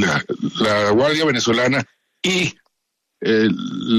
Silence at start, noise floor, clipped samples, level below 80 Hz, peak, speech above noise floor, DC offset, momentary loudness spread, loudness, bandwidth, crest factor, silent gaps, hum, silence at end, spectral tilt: 0 s; -76 dBFS; under 0.1%; -56 dBFS; -6 dBFS; 58 dB; under 0.1%; 8 LU; -18 LUFS; 13.5 kHz; 14 dB; none; none; 0 s; -4.5 dB/octave